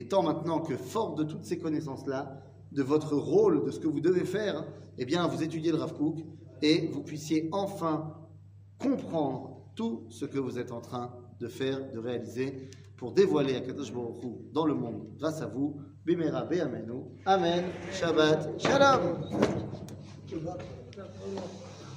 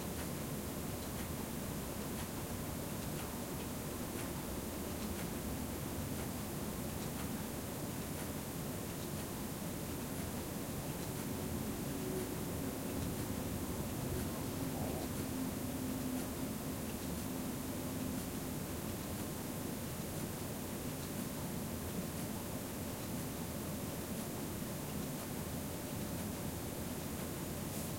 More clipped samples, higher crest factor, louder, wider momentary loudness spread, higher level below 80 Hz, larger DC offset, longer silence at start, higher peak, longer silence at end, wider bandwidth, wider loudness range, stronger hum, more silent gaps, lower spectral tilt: neither; first, 22 dB vs 14 dB; first, -31 LUFS vs -41 LUFS; first, 16 LU vs 2 LU; second, -66 dBFS vs -54 dBFS; neither; about the same, 0 s vs 0 s; first, -8 dBFS vs -28 dBFS; about the same, 0 s vs 0 s; about the same, 15.5 kHz vs 16.5 kHz; first, 8 LU vs 2 LU; neither; neither; about the same, -6 dB/octave vs -5 dB/octave